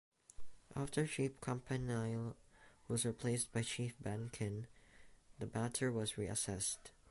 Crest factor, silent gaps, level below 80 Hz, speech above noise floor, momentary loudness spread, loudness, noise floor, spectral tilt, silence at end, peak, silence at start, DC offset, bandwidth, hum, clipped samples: 20 dB; none; -64 dBFS; 21 dB; 10 LU; -41 LUFS; -62 dBFS; -4.5 dB/octave; 0 s; -22 dBFS; 0.4 s; under 0.1%; 12 kHz; none; under 0.1%